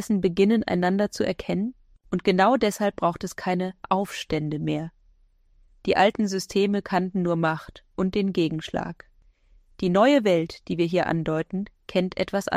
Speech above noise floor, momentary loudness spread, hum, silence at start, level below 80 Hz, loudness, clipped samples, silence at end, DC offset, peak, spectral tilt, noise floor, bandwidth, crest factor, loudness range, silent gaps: 36 dB; 11 LU; none; 0 s; -54 dBFS; -24 LUFS; under 0.1%; 0 s; under 0.1%; -6 dBFS; -6 dB/octave; -59 dBFS; 15 kHz; 18 dB; 3 LU; none